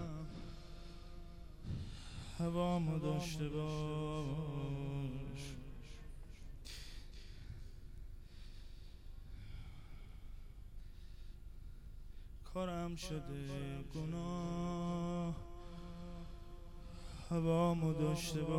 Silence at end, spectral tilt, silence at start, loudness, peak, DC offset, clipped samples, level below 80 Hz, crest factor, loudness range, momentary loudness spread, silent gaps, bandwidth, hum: 0 s; -6.5 dB/octave; 0 s; -42 LUFS; -24 dBFS; under 0.1%; under 0.1%; -52 dBFS; 18 dB; 16 LU; 21 LU; none; 15.5 kHz; none